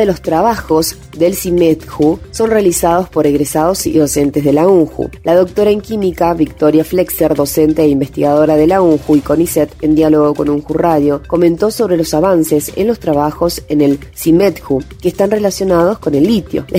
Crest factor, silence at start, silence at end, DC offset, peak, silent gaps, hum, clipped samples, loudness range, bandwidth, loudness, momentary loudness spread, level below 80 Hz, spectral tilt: 12 dB; 0 s; 0 s; under 0.1%; 0 dBFS; none; none; under 0.1%; 2 LU; 16.5 kHz; -12 LUFS; 5 LU; -36 dBFS; -6 dB/octave